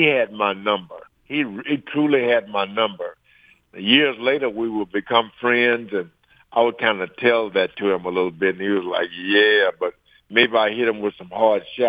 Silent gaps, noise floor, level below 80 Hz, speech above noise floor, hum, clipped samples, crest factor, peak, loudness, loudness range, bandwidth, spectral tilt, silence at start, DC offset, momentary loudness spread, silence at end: none; -55 dBFS; -66 dBFS; 35 dB; none; under 0.1%; 20 dB; -2 dBFS; -20 LUFS; 2 LU; 5 kHz; -7 dB/octave; 0 s; under 0.1%; 10 LU; 0 s